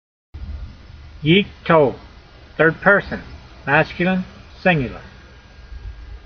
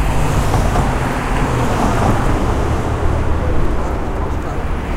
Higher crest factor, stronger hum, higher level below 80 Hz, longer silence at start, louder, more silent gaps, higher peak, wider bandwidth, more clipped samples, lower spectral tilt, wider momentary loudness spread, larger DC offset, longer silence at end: first, 20 dB vs 14 dB; neither; second, -40 dBFS vs -20 dBFS; first, 0.35 s vs 0 s; about the same, -17 LUFS vs -18 LUFS; neither; about the same, 0 dBFS vs -2 dBFS; second, 6.4 kHz vs 16 kHz; neither; second, -4 dB/octave vs -6.5 dB/octave; first, 22 LU vs 6 LU; neither; about the same, 0.05 s vs 0 s